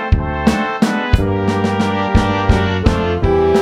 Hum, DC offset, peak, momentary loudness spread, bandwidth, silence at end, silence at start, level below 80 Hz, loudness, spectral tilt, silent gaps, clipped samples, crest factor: none; under 0.1%; 0 dBFS; 2 LU; 13 kHz; 0 s; 0 s; -22 dBFS; -16 LUFS; -7 dB/octave; none; under 0.1%; 14 dB